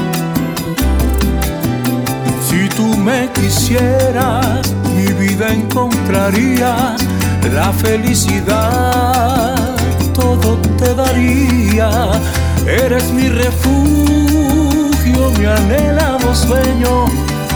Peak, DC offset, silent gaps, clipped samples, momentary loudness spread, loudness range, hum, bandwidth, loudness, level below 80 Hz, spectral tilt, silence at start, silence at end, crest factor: 0 dBFS; under 0.1%; none; under 0.1%; 4 LU; 2 LU; none; over 20 kHz; -13 LUFS; -20 dBFS; -5.5 dB/octave; 0 s; 0 s; 12 dB